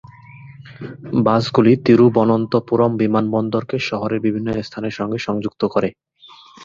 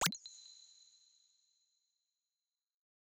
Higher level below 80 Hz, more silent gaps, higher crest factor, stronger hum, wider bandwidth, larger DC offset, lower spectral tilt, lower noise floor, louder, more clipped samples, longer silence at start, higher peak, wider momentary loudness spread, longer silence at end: first, -54 dBFS vs -80 dBFS; neither; second, 18 dB vs 30 dB; neither; second, 7.4 kHz vs 9.6 kHz; neither; first, -7.5 dB/octave vs -1.5 dB/octave; second, -45 dBFS vs under -90 dBFS; first, -18 LUFS vs -44 LUFS; neither; first, 0.35 s vs 0 s; first, 0 dBFS vs -18 dBFS; second, 12 LU vs 22 LU; second, 0 s vs 2.6 s